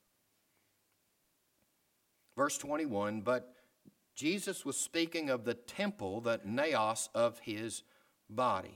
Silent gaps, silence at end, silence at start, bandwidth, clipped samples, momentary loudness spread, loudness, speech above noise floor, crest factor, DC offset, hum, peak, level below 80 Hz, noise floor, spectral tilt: none; 0 s; 2.35 s; 18 kHz; under 0.1%; 8 LU; -36 LUFS; 42 dB; 20 dB; under 0.1%; none; -18 dBFS; -80 dBFS; -77 dBFS; -3.5 dB/octave